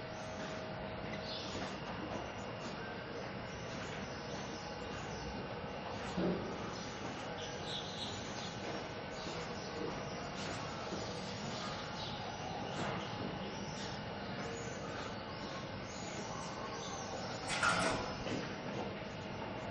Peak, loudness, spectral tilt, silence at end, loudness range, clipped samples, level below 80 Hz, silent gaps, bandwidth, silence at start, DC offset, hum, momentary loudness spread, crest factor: -20 dBFS; -42 LUFS; -4 dB/octave; 0 s; 5 LU; under 0.1%; -60 dBFS; none; 8.2 kHz; 0 s; under 0.1%; none; 5 LU; 22 dB